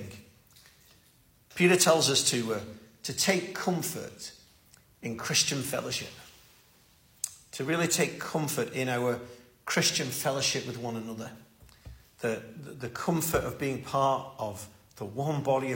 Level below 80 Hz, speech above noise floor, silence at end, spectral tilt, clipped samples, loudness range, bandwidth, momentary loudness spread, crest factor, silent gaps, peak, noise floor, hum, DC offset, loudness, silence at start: -60 dBFS; 33 dB; 0 s; -3 dB/octave; under 0.1%; 6 LU; 16.5 kHz; 19 LU; 22 dB; none; -8 dBFS; -63 dBFS; none; under 0.1%; -29 LUFS; 0 s